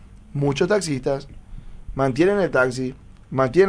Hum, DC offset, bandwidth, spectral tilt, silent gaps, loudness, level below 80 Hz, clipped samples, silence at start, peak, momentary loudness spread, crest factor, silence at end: none; under 0.1%; 10.5 kHz; -6 dB/octave; none; -22 LUFS; -42 dBFS; under 0.1%; 0 s; -4 dBFS; 13 LU; 18 dB; 0 s